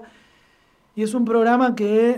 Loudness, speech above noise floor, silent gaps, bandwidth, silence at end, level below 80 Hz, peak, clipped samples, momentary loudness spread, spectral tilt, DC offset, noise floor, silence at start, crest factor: -19 LUFS; 41 dB; none; 12 kHz; 0 s; -66 dBFS; -6 dBFS; under 0.1%; 10 LU; -6 dB/octave; under 0.1%; -59 dBFS; 0 s; 14 dB